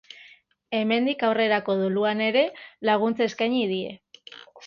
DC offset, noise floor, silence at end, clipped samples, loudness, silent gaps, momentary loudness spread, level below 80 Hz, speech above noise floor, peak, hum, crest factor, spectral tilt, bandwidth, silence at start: under 0.1%; -55 dBFS; 0 s; under 0.1%; -24 LUFS; none; 16 LU; -68 dBFS; 31 dB; -8 dBFS; none; 18 dB; -6 dB/octave; 7 kHz; 0.2 s